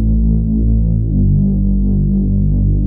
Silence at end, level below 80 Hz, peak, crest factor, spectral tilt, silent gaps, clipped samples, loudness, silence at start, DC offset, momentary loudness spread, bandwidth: 0 s; -16 dBFS; -4 dBFS; 8 dB; -20 dB/octave; none; under 0.1%; -15 LUFS; 0 s; under 0.1%; 2 LU; 0.9 kHz